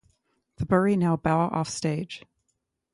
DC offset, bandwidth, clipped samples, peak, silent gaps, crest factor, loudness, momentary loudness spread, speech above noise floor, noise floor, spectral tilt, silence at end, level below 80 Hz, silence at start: under 0.1%; 11.5 kHz; under 0.1%; -10 dBFS; none; 18 dB; -25 LUFS; 14 LU; 54 dB; -78 dBFS; -6.5 dB/octave; 0.75 s; -54 dBFS; 0.6 s